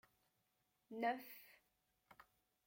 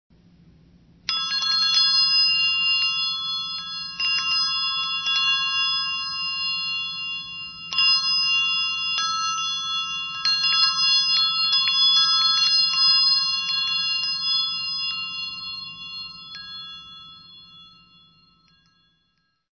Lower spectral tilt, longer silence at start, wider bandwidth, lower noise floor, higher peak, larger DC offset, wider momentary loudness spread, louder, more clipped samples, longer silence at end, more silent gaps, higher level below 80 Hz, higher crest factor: first, -4.5 dB/octave vs 2 dB/octave; second, 0.9 s vs 1.1 s; first, 16.5 kHz vs 6.6 kHz; first, -85 dBFS vs -71 dBFS; second, -28 dBFS vs -6 dBFS; neither; first, 24 LU vs 17 LU; second, -46 LUFS vs -19 LUFS; neither; second, 0.45 s vs 1.9 s; neither; second, under -90 dBFS vs -62 dBFS; first, 24 dB vs 16 dB